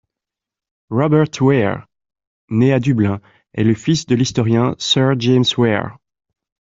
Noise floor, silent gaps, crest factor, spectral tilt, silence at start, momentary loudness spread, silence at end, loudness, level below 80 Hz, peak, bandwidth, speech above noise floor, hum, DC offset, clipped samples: -86 dBFS; 2.27-2.48 s; 16 dB; -6 dB/octave; 0.9 s; 8 LU; 0.8 s; -16 LUFS; -52 dBFS; -2 dBFS; 7.8 kHz; 71 dB; none; under 0.1%; under 0.1%